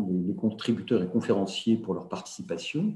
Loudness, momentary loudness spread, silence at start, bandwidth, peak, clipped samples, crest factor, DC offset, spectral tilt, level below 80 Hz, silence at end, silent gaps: -29 LUFS; 9 LU; 0 s; 11.5 kHz; -12 dBFS; under 0.1%; 16 dB; under 0.1%; -6 dB/octave; -72 dBFS; 0 s; none